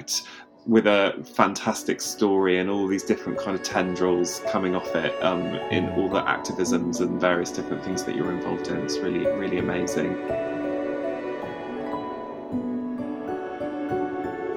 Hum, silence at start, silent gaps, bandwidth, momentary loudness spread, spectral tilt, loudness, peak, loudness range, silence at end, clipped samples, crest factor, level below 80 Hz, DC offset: none; 0 s; none; 19.5 kHz; 9 LU; -4.5 dB/octave; -26 LUFS; -2 dBFS; 7 LU; 0 s; under 0.1%; 24 dB; -58 dBFS; under 0.1%